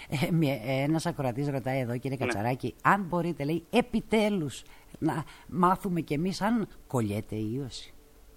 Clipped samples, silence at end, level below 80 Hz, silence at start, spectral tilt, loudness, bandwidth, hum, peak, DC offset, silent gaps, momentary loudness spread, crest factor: under 0.1%; 0.05 s; -54 dBFS; 0 s; -6.5 dB/octave; -29 LUFS; 17 kHz; none; -8 dBFS; under 0.1%; none; 8 LU; 20 dB